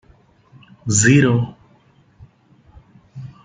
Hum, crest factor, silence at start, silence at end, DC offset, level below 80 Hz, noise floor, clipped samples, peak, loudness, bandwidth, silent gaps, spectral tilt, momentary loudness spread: none; 20 dB; 0.85 s; 0.15 s; under 0.1%; -54 dBFS; -54 dBFS; under 0.1%; -2 dBFS; -15 LUFS; 9.6 kHz; none; -5 dB/octave; 25 LU